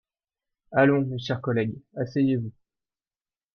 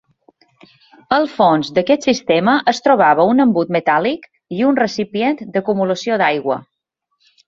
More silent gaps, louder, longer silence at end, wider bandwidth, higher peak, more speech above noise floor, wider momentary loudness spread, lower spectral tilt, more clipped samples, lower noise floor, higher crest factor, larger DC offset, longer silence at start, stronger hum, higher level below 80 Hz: neither; second, -25 LUFS vs -16 LUFS; first, 1.05 s vs 0.85 s; second, 6.4 kHz vs 7.6 kHz; second, -8 dBFS vs 0 dBFS; first, over 66 dB vs 56 dB; first, 11 LU vs 8 LU; first, -8 dB/octave vs -5.5 dB/octave; neither; first, under -90 dBFS vs -71 dBFS; about the same, 20 dB vs 16 dB; neither; second, 0.7 s vs 1.1 s; neither; about the same, -64 dBFS vs -60 dBFS